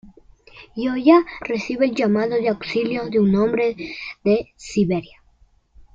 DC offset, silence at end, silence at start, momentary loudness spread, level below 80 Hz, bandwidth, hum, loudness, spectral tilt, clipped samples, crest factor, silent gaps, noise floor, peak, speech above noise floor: under 0.1%; 0.9 s; 0.05 s; 11 LU; -52 dBFS; 7.8 kHz; none; -20 LUFS; -7 dB/octave; under 0.1%; 18 dB; none; -56 dBFS; -2 dBFS; 37 dB